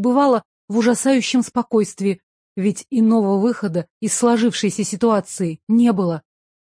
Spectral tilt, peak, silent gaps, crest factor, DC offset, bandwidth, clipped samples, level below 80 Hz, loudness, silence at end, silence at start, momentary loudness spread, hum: -5 dB/octave; -4 dBFS; 0.45-0.68 s, 2.23-2.56 s, 3.90-4.01 s, 5.63-5.67 s; 14 dB; under 0.1%; 10.5 kHz; under 0.1%; -64 dBFS; -19 LUFS; 0.55 s; 0 s; 8 LU; none